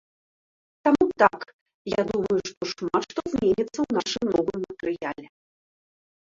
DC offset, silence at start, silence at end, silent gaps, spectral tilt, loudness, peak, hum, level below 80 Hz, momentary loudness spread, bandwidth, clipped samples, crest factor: under 0.1%; 0.85 s; 1.05 s; 1.53-1.66 s, 1.74-1.85 s, 2.57-2.61 s; -5 dB/octave; -25 LUFS; -4 dBFS; none; -56 dBFS; 11 LU; 7.6 kHz; under 0.1%; 22 dB